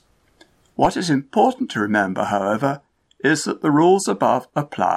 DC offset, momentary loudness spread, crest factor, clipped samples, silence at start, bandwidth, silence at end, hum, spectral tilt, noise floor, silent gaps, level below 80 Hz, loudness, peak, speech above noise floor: under 0.1%; 7 LU; 16 dB; under 0.1%; 0.8 s; 14 kHz; 0 s; none; -5 dB/octave; -55 dBFS; none; -54 dBFS; -19 LUFS; -2 dBFS; 37 dB